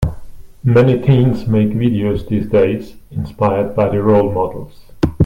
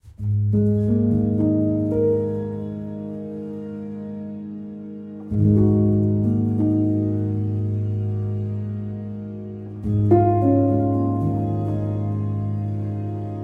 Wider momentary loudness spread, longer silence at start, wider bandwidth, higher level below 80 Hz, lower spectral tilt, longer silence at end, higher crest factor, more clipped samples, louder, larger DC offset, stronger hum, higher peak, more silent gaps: about the same, 12 LU vs 14 LU; about the same, 0 s vs 0.05 s; first, 11 kHz vs 2.6 kHz; first, -34 dBFS vs -46 dBFS; second, -9.5 dB/octave vs -12.5 dB/octave; about the same, 0 s vs 0 s; about the same, 14 dB vs 18 dB; neither; first, -15 LUFS vs -22 LUFS; neither; neither; first, 0 dBFS vs -4 dBFS; neither